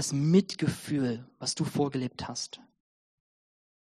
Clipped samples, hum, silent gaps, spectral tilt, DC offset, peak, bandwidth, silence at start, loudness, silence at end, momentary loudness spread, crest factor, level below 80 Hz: under 0.1%; none; none; -5.5 dB/octave; under 0.1%; -10 dBFS; 13 kHz; 0 s; -30 LUFS; 1.4 s; 12 LU; 20 dB; -64 dBFS